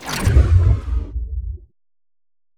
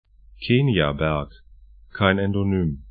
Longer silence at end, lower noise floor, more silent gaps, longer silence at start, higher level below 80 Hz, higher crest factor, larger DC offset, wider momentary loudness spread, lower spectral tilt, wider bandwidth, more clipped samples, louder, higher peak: first, 1 s vs 0 s; first, under -90 dBFS vs -48 dBFS; neither; second, 0 s vs 0.4 s; first, -22 dBFS vs -42 dBFS; about the same, 18 dB vs 22 dB; neither; about the same, 17 LU vs 15 LU; second, -6 dB/octave vs -11.5 dB/octave; first, 15 kHz vs 4.9 kHz; neither; first, -18 LUFS vs -22 LUFS; about the same, -2 dBFS vs -2 dBFS